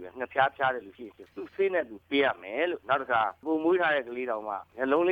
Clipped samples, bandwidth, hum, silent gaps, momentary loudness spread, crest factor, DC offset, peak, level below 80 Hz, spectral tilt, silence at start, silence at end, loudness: under 0.1%; 4.9 kHz; none; none; 13 LU; 18 dB; under 0.1%; -10 dBFS; -70 dBFS; -6.5 dB/octave; 0 s; 0 s; -28 LUFS